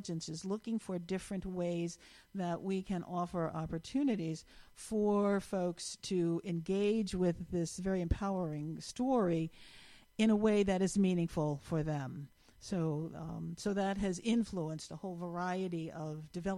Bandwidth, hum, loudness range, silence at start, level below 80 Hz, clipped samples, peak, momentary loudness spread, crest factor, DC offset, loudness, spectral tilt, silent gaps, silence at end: 12.5 kHz; none; 5 LU; 0 s; -54 dBFS; under 0.1%; -18 dBFS; 12 LU; 18 dB; under 0.1%; -36 LUFS; -6.5 dB/octave; none; 0 s